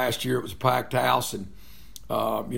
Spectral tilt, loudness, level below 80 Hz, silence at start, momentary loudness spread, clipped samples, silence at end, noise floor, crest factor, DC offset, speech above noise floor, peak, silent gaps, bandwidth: -4.5 dB/octave; -26 LUFS; -52 dBFS; 0 s; 20 LU; under 0.1%; 0 s; -48 dBFS; 22 dB; 0.8%; 22 dB; -6 dBFS; none; 16.5 kHz